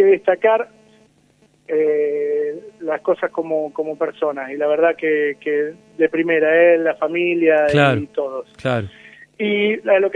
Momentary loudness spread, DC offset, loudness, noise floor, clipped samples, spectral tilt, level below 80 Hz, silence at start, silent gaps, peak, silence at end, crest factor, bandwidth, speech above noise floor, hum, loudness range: 11 LU; under 0.1%; -18 LUFS; -56 dBFS; under 0.1%; -7 dB/octave; -58 dBFS; 0 s; none; -2 dBFS; 0 s; 16 dB; 9.6 kHz; 39 dB; none; 5 LU